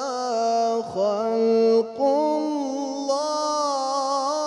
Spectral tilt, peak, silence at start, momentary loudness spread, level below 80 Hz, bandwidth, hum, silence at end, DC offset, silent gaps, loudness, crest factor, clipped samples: -4 dB/octave; -10 dBFS; 0 s; 6 LU; -72 dBFS; 11 kHz; 50 Hz at -70 dBFS; 0 s; under 0.1%; none; -23 LUFS; 12 dB; under 0.1%